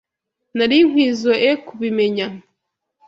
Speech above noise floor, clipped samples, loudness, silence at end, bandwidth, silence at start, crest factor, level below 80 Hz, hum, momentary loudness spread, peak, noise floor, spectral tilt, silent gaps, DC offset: 61 dB; under 0.1%; -17 LUFS; 0.7 s; 7.8 kHz; 0.55 s; 16 dB; -62 dBFS; none; 11 LU; -2 dBFS; -77 dBFS; -5 dB/octave; none; under 0.1%